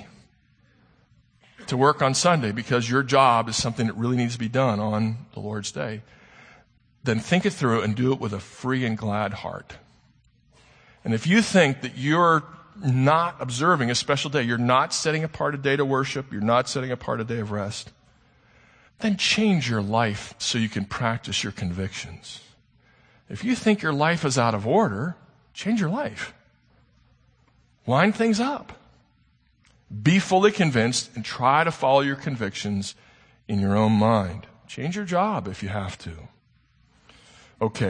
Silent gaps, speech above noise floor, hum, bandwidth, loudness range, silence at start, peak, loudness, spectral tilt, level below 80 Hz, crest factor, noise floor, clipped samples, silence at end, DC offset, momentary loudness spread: none; 40 dB; none; 9.8 kHz; 6 LU; 0 s; -4 dBFS; -23 LUFS; -5 dB/octave; -58 dBFS; 20 dB; -63 dBFS; under 0.1%; 0 s; under 0.1%; 14 LU